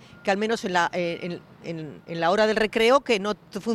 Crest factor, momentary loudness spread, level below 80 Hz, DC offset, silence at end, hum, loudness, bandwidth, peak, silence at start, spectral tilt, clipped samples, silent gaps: 18 dB; 15 LU; -58 dBFS; under 0.1%; 0 s; none; -23 LUFS; 13 kHz; -6 dBFS; 0.25 s; -4.5 dB/octave; under 0.1%; none